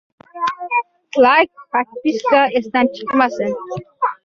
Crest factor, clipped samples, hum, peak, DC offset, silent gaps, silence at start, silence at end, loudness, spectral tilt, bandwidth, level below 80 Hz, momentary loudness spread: 16 dB; under 0.1%; none; -2 dBFS; under 0.1%; none; 0.35 s; 0.1 s; -17 LUFS; -5 dB/octave; 7.2 kHz; -62 dBFS; 11 LU